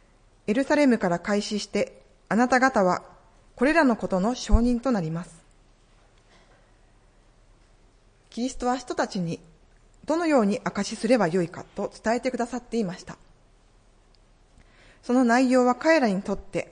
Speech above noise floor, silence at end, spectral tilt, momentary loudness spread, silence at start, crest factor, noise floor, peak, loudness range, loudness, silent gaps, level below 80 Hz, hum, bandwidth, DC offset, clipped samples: 34 dB; 0.1 s; -5.5 dB/octave; 13 LU; 0.5 s; 20 dB; -58 dBFS; -6 dBFS; 9 LU; -24 LUFS; none; -40 dBFS; none; 10.5 kHz; under 0.1%; under 0.1%